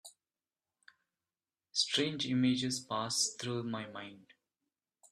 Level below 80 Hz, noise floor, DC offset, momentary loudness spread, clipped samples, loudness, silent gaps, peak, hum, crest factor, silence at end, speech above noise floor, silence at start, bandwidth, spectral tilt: -76 dBFS; under -90 dBFS; under 0.1%; 12 LU; under 0.1%; -34 LUFS; none; -18 dBFS; none; 20 dB; 0.9 s; over 55 dB; 0.05 s; 13 kHz; -3 dB/octave